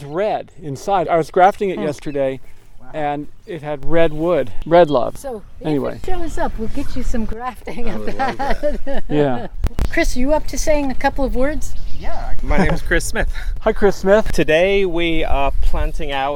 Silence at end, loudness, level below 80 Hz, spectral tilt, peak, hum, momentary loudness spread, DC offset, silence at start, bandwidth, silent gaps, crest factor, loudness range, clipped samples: 0 s; -19 LUFS; -24 dBFS; -5.5 dB/octave; 0 dBFS; none; 14 LU; under 0.1%; 0 s; 12.5 kHz; none; 14 dB; 6 LU; under 0.1%